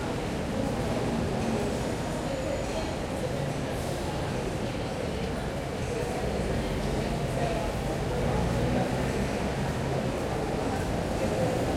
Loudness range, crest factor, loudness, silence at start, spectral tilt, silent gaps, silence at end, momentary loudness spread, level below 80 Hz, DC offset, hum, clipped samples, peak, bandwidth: 2 LU; 14 dB; -30 LUFS; 0 s; -6 dB/octave; none; 0 s; 4 LU; -40 dBFS; under 0.1%; none; under 0.1%; -14 dBFS; 16.5 kHz